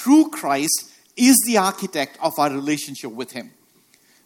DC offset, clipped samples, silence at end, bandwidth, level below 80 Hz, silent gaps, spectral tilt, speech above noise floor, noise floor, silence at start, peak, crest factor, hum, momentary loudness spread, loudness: under 0.1%; under 0.1%; 0.8 s; 17.5 kHz; -68 dBFS; none; -3 dB/octave; 38 dB; -57 dBFS; 0 s; 0 dBFS; 20 dB; none; 17 LU; -19 LUFS